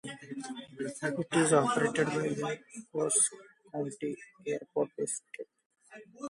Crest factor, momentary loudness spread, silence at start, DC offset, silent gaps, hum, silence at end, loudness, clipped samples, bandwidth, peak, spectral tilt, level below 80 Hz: 22 dB; 16 LU; 0.05 s; under 0.1%; 5.66-5.70 s; none; 0 s; -32 LUFS; under 0.1%; 11.5 kHz; -12 dBFS; -4 dB/octave; -78 dBFS